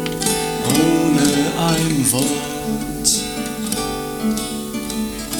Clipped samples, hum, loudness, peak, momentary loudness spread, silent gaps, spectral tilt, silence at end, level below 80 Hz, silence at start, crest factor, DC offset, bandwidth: under 0.1%; none; -19 LUFS; 0 dBFS; 9 LU; none; -3.5 dB/octave; 0 s; -40 dBFS; 0 s; 18 dB; under 0.1%; 19 kHz